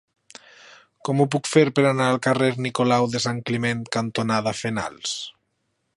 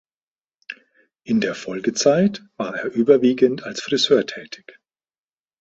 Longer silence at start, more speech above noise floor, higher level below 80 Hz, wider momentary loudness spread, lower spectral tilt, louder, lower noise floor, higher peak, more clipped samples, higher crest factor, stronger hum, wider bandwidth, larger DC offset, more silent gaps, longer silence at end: first, 1.05 s vs 0.7 s; second, 52 dB vs over 71 dB; about the same, -62 dBFS vs -64 dBFS; second, 9 LU vs 22 LU; about the same, -5 dB/octave vs -4.5 dB/octave; about the same, -22 LUFS vs -20 LUFS; second, -73 dBFS vs under -90 dBFS; about the same, -4 dBFS vs -2 dBFS; neither; about the same, 20 dB vs 20 dB; neither; first, 11.5 kHz vs 8 kHz; neither; neither; second, 0.65 s vs 1.05 s